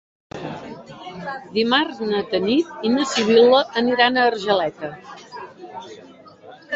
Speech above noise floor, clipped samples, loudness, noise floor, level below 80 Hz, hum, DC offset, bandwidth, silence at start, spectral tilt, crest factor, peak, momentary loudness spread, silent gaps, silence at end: 26 dB; under 0.1%; -18 LUFS; -44 dBFS; -60 dBFS; none; under 0.1%; 8 kHz; 0.35 s; -4 dB/octave; 20 dB; -2 dBFS; 22 LU; none; 0 s